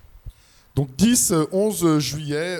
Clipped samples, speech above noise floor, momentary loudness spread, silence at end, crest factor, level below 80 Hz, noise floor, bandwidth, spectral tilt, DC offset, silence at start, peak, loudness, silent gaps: under 0.1%; 22 dB; 10 LU; 0 s; 16 dB; -46 dBFS; -42 dBFS; 19.5 kHz; -4.5 dB/octave; under 0.1%; 0.25 s; -6 dBFS; -20 LUFS; none